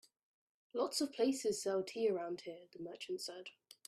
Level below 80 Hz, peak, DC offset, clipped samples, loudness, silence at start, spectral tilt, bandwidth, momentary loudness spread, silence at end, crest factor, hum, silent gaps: -86 dBFS; -24 dBFS; under 0.1%; under 0.1%; -39 LUFS; 0.75 s; -3.5 dB/octave; 15.5 kHz; 15 LU; 0.35 s; 18 dB; none; none